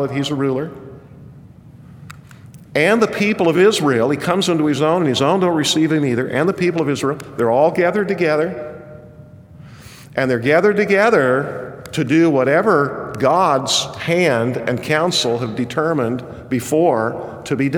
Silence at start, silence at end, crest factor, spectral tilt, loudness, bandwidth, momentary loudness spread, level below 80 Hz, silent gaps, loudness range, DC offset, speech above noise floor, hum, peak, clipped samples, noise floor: 0 s; 0 s; 16 dB; -5 dB/octave; -17 LUFS; 19 kHz; 10 LU; -54 dBFS; none; 4 LU; under 0.1%; 25 dB; none; -2 dBFS; under 0.1%; -41 dBFS